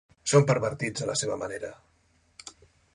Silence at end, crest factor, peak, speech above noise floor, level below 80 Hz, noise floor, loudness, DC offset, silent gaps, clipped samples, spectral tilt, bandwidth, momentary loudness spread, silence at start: 0.45 s; 22 dB; -6 dBFS; 40 dB; -62 dBFS; -66 dBFS; -27 LUFS; under 0.1%; none; under 0.1%; -4.5 dB/octave; 11.5 kHz; 24 LU; 0.25 s